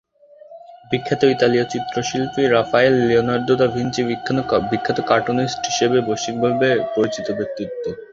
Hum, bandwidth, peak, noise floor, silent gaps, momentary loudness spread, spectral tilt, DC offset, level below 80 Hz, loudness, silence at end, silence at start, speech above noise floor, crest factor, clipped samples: none; 7.8 kHz; -2 dBFS; -46 dBFS; none; 9 LU; -5 dB/octave; under 0.1%; -52 dBFS; -19 LUFS; 0.1 s; 0.5 s; 27 dB; 18 dB; under 0.1%